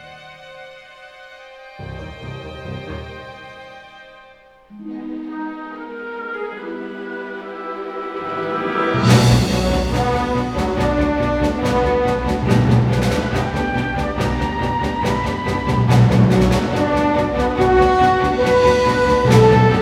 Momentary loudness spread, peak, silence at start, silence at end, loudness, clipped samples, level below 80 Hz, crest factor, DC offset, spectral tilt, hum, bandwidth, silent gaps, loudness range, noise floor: 20 LU; 0 dBFS; 0 s; 0 s; -17 LUFS; under 0.1%; -32 dBFS; 18 dB; under 0.1%; -6.5 dB/octave; none; 14.5 kHz; none; 18 LU; -46 dBFS